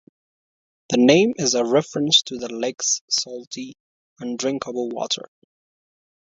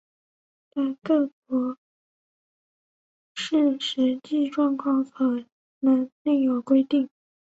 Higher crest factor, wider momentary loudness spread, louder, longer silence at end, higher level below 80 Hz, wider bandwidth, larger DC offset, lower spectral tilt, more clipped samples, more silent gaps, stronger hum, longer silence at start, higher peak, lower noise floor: first, 22 dB vs 16 dB; first, 16 LU vs 11 LU; first, -20 LUFS vs -25 LUFS; first, 1.15 s vs 0.5 s; first, -68 dBFS vs -74 dBFS; about the same, 7.8 kHz vs 8 kHz; neither; second, -3 dB/octave vs -4.5 dB/octave; neither; second, 3.01-3.08 s, 3.47-3.51 s, 3.80-4.16 s vs 1.33-1.42 s, 1.78-3.35 s, 5.52-5.81 s, 6.12-6.25 s; neither; first, 0.9 s vs 0.75 s; first, 0 dBFS vs -10 dBFS; about the same, under -90 dBFS vs under -90 dBFS